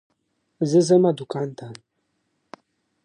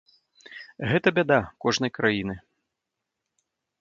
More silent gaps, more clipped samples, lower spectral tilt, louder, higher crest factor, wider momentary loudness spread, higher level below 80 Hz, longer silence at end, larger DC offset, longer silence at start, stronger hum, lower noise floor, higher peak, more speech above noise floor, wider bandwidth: neither; neither; first, -7 dB/octave vs -5 dB/octave; first, -21 LUFS vs -24 LUFS; about the same, 18 dB vs 22 dB; about the same, 20 LU vs 21 LU; second, -74 dBFS vs -56 dBFS; second, 1.3 s vs 1.45 s; neither; about the same, 0.6 s vs 0.5 s; neither; second, -73 dBFS vs -84 dBFS; about the same, -6 dBFS vs -6 dBFS; second, 53 dB vs 60 dB; first, 10 kHz vs 7.6 kHz